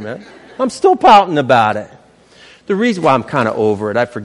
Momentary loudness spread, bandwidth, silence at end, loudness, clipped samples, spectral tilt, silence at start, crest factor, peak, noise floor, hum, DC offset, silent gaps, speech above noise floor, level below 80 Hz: 13 LU; 11.5 kHz; 0 s; -13 LUFS; under 0.1%; -5.5 dB/octave; 0 s; 14 dB; 0 dBFS; -45 dBFS; none; under 0.1%; none; 32 dB; -52 dBFS